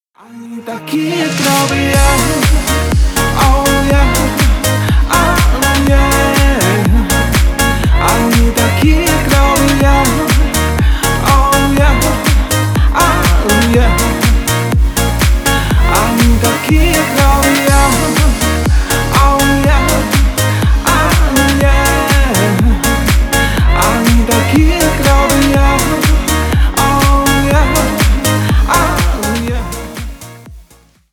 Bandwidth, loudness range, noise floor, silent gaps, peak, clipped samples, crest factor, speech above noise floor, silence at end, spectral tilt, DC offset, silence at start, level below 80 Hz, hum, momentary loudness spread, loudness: 19.5 kHz; 1 LU; -45 dBFS; none; 0 dBFS; under 0.1%; 10 dB; 33 dB; 0.5 s; -4.5 dB/octave; under 0.1%; 0.3 s; -14 dBFS; none; 3 LU; -11 LUFS